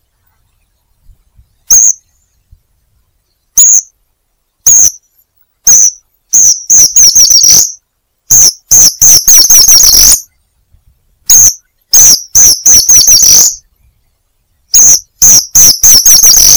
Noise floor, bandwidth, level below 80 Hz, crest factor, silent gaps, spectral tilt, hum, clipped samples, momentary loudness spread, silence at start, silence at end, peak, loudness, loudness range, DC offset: -60 dBFS; over 20 kHz; -34 dBFS; 6 dB; none; 2 dB/octave; none; 20%; 8 LU; 1.7 s; 0 s; 0 dBFS; -1 LUFS; 7 LU; under 0.1%